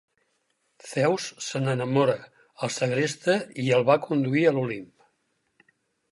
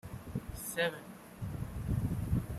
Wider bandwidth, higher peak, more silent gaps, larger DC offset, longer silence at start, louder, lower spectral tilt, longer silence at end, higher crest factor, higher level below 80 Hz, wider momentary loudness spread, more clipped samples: second, 11.5 kHz vs 15.5 kHz; first, -8 dBFS vs -20 dBFS; neither; neither; first, 0.85 s vs 0.05 s; first, -25 LUFS vs -38 LUFS; about the same, -5.5 dB/octave vs -5.5 dB/octave; first, 1.25 s vs 0 s; about the same, 20 dB vs 18 dB; second, -74 dBFS vs -46 dBFS; about the same, 10 LU vs 11 LU; neither